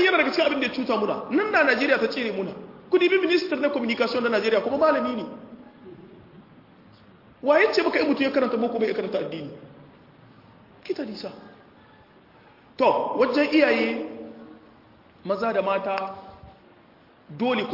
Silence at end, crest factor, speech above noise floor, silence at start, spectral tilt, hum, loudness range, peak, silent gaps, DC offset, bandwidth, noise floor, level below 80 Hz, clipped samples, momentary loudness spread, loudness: 0 s; 20 dB; 31 dB; 0 s; -5.5 dB/octave; none; 8 LU; -6 dBFS; none; under 0.1%; 5.8 kHz; -54 dBFS; -66 dBFS; under 0.1%; 17 LU; -23 LUFS